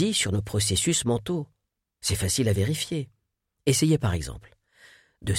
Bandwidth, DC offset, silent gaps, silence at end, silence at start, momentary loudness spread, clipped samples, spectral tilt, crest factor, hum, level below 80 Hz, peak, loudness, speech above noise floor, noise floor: 16.5 kHz; under 0.1%; none; 0 s; 0 s; 14 LU; under 0.1%; -4 dB/octave; 18 dB; none; -46 dBFS; -10 dBFS; -25 LUFS; 54 dB; -79 dBFS